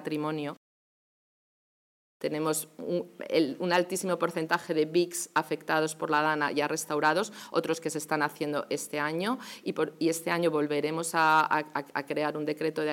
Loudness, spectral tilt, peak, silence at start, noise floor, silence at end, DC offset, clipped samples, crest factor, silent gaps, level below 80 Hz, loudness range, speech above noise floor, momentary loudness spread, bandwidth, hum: -29 LUFS; -4 dB/octave; -10 dBFS; 0 s; under -90 dBFS; 0 s; under 0.1%; under 0.1%; 20 dB; 0.57-2.20 s; -86 dBFS; 4 LU; over 61 dB; 7 LU; 17 kHz; none